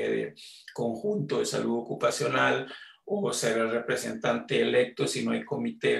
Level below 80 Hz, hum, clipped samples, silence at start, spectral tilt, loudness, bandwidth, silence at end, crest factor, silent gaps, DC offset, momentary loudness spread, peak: -72 dBFS; none; under 0.1%; 0 s; -4 dB/octave; -28 LUFS; 13.5 kHz; 0 s; 18 dB; none; under 0.1%; 9 LU; -12 dBFS